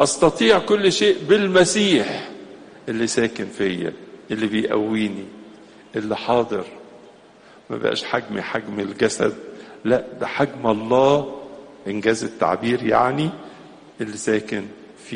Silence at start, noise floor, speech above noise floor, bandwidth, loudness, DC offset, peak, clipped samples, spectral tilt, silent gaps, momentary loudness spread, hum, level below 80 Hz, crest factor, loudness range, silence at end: 0 s; -48 dBFS; 28 dB; 10 kHz; -21 LUFS; under 0.1%; -2 dBFS; under 0.1%; -4 dB/octave; none; 20 LU; none; -56 dBFS; 20 dB; 6 LU; 0 s